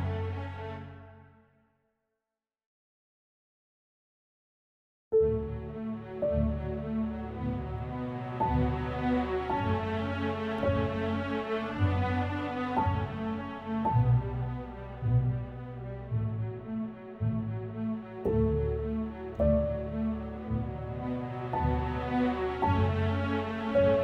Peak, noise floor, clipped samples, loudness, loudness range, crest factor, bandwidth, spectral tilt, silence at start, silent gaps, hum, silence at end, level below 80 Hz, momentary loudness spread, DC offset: -16 dBFS; under -90 dBFS; under 0.1%; -32 LUFS; 4 LU; 16 dB; 6.2 kHz; -9.5 dB/octave; 0 s; 2.66-5.11 s; none; 0 s; -42 dBFS; 10 LU; under 0.1%